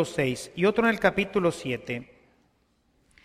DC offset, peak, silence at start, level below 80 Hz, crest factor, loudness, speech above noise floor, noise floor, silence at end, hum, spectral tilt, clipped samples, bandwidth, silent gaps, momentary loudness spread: under 0.1%; -8 dBFS; 0 s; -56 dBFS; 20 dB; -26 LUFS; 42 dB; -68 dBFS; 1.2 s; none; -5.5 dB/octave; under 0.1%; 15 kHz; none; 10 LU